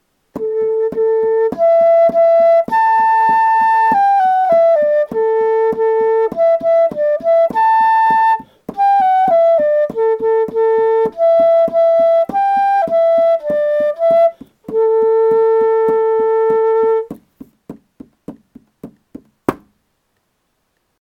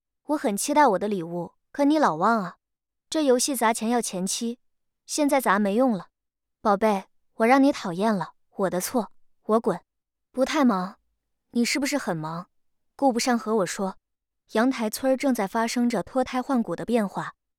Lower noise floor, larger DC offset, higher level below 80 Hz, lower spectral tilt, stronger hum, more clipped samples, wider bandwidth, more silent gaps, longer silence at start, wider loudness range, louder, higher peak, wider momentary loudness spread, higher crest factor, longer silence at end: second, -66 dBFS vs -84 dBFS; neither; first, -56 dBFS vs -64 dBFS; first, -6.5 dB/octave vs -4.5 dB/octave; neither; neither; second, 6 kHz vs 17.5 kHz; neither; about the same, 0.35 s vs 0.3 s; first, 8 LU vs 3 LU; first, -13 LUFS vs -24 LUFS; first, 0 dBFS vs -6 dBFS; second, 6 LU vs 12 LU; about the same, 14 dB vs 18 dB; first, 1.5 s vs 0.25 s